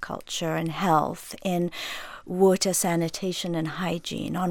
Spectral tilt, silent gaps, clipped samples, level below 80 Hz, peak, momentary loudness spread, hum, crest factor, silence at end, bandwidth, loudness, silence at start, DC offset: -4.5 dB/octave; none; under 0.1%; -56 dBFS; -8 dBFS; 11 LU; none; 18 dB; 0 s; 17.5 kHz; -26 LUFS; 0 s; under 0.1%